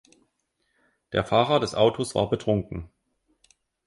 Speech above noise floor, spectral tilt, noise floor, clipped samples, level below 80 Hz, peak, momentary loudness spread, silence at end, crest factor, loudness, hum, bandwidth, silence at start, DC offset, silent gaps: 51 dB; -5.5 dB/octave; -74 dBFS; under 0.1%; -50 dBFS; -6 dBFS; 9 LU; 1 s; 20 dB; -24 LUFS; none; 11.5 kHz; 1.1 s; under 0.1%; none